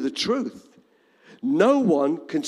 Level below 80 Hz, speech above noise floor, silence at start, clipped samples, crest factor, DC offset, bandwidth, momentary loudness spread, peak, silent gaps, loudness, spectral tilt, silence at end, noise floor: -68 dBFS; 37 dB; 0 s; under 0.1%; 16 dB; under 0.1%; 12 kHz; 11 LU; -6 dBFS; none; -22 LUFS; -5.5 dB/octave; 0 s; -58 dBFS